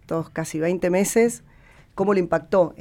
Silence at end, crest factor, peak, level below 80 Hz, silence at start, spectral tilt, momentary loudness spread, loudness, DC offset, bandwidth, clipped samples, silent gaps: 0.1 s; 16 dB; -8 dBFS; -52 dBFS; 0.1 s; -5.5 dB/octave; 9 LU; -22 LUFS; under 0.1%; 17 kHz; under 0.1%; none